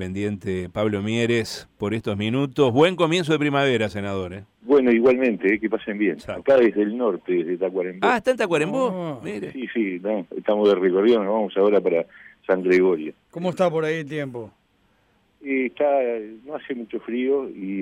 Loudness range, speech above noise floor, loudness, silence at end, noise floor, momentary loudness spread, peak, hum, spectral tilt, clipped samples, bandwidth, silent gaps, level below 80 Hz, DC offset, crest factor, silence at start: 5 LU; 42 dB; -22 LUFS; 0 s; -63 dBFS; 13 LU; -6 dBFS; none; -6.5 dB/octave; under 0.1%; 12.5 kHz; none; -60 dBFS; under 0.1%; 16 dB; 0 s